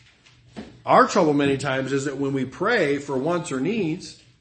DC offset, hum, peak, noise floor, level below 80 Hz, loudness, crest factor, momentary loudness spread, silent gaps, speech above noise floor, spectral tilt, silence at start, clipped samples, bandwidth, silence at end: under 0.1%; none; -2 dBFS; -54 dBFS; -58 dBFS; -22 LUFS; 20 dB; 16 LU; none; 32 dB; -5.5 dB/octave; 0.55 s; under 0.1%; 8.8 kHz; 0.25 s